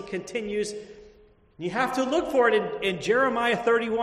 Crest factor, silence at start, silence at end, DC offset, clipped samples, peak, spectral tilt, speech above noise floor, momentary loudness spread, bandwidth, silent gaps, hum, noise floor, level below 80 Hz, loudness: 16 dB; 0 s; 0 s; under 0.1%; under 0.1%; -8 dBFS; -4.5 dB/octave; 31 dB; 10 LU; 13 kHz; none; none; -56 dBFS; -58 dBFS; -25 LUFS